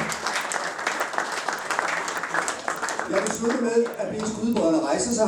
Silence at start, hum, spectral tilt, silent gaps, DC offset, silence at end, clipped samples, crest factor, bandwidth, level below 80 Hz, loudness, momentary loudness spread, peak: 0 s; none; -3 dB/octave; none; under 0.1%; 0 s; under 0.1%; 20 dB; 19 kHz; -60 dBFS; -25 LUFS; 5 LU; -6 dBFS